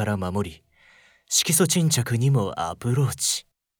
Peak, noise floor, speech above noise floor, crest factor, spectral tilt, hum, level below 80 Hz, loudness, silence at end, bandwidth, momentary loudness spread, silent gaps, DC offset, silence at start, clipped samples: -6 dBFS; -56 dBFS; 33 dB; 18 dB; -4 dB/octave; none; -56 dBFS; -22 LUFS; 0.4 s; 19.5 kHz; 9 LU; none; under 0.1%; 0 s; under 0.1%